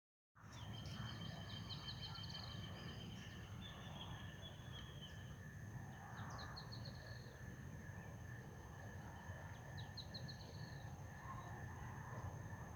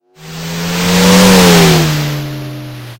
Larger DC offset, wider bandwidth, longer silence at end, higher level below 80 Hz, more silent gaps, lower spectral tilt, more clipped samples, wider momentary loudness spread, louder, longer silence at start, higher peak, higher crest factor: neither; first, over 20 kHz vs 17 kHz; about the same, 0 s vs 0.05 s; second, -66 dBFS vs -34 dBFS; neither; about the same, -5 dB/octave vs -4.5 dB/octave; second, under 0.1% vs 1%; second, 5 LU vs 20 LU; second, -53 LUFS vs -8 LUFS; first, 0.35 s vs 0.2 s; second, -38 dBFS vs 0 dBFS; about the same, 14 dB vs 10 dB